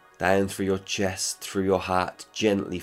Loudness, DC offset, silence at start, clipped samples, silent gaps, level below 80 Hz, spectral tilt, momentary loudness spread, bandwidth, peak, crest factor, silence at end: -26 LUFS; under 0.1%; 0.2 s; under 0.1%; none; -62 dBFS; -4 dB/octave; 4 LU; 16 kHz; -6 dBFS; 20 dB; 0 s